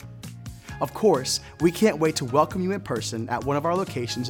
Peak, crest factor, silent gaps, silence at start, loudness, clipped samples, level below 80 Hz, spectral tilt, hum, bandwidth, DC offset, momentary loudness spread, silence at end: -6 dBFS; 18 dB; none; 0 s; -24 LUFS; under 0.1%; -52 dBFS; -5 dB/octave; none; 19 kHz; under 0.1%; 18 LU; 0 s